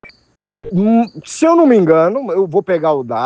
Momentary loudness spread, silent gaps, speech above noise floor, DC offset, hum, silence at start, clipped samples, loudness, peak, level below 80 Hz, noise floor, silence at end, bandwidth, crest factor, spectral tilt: 7 LU; none; 45 dB; under 0.1%; none; 0.05 s; under 0.1%; -13 LUFS; 0 dBFS; -54 dBFS; -58 dBFS; 0 s; 9.6 kHz; 14 dB; -7 dB/octave